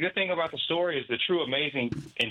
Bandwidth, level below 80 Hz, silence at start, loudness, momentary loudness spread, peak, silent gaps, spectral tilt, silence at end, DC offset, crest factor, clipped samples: 10.5 kHz; -64 dBFS; 0 s; -28 LUFS; 4 LU; -12 dBFS; none; -5.5 dB/octave; 0 s; under 0.1%; 16 dB; under 0.1%